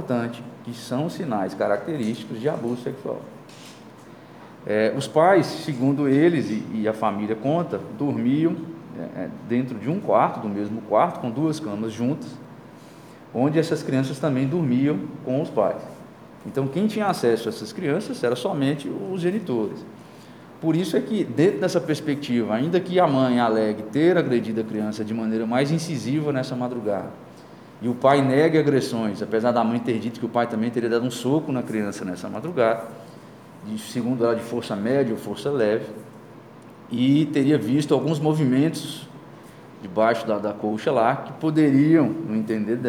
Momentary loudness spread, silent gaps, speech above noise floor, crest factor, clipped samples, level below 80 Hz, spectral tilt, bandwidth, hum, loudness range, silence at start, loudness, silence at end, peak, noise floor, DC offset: 14 LU; none; 22 dB; 20 dB; under 0.1%; -68 dBFS; -7 dB/octave; 16 kHz; none; 5 LU; 0 s; -23 LUFS; 0 s; -4 dBFS; -44 dBFS; under 0.1%